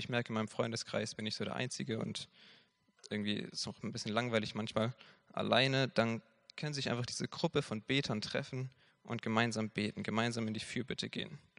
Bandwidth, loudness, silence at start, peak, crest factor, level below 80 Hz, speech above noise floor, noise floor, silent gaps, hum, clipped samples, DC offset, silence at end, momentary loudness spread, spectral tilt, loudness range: 10.5 kHz; -37 LUFS; 0 s; -14 dBFS; 24 dB; -72 dBFS; 25 dB; -62 dBFS; none; none; under 0.1%; under 0.1%; 0.2 s; 11 LU; -4.5 dB/octave; 5 LU